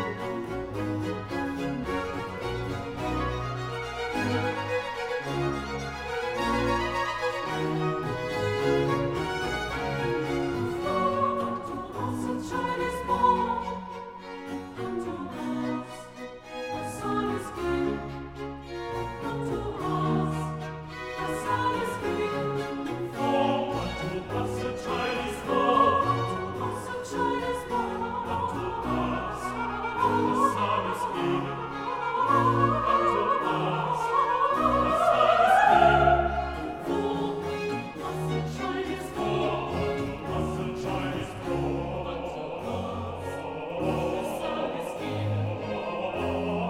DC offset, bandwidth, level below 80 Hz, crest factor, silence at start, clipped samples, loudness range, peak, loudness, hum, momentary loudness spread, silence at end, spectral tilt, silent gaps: under 0.1%; 16.5 kHz; -46 dBFS; 22 dB; 0 s; under 0.1%; 9 LU; -6 dBFS; -28 LUFS; none; 11 LU; 0 s; -6 dB/octave; none